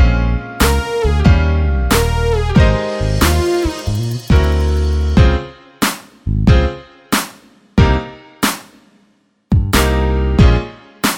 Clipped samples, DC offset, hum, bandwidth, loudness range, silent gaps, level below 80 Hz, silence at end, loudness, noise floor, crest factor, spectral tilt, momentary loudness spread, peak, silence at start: under 0.1%; under 0.1%; none; 17 kHz; 3 LU; none; -18 dBFS; 0 s; -15 LUFS; -57 dBFS; 14 dB; -5.5 dB/octave; 8 LU; 0 dBFS; 0 s